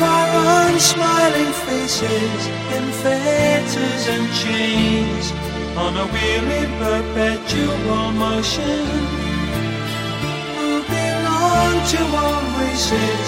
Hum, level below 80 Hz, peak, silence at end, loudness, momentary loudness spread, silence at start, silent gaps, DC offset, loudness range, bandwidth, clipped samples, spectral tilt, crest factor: none; -34 dBFS; 0 dBFS; 0 s; -18 LUFS; 8 LU; 0 s; none; under 0.1%; 4 LU; 16.5 kHz; under 0.1%; -4 dB/octave; 18 dB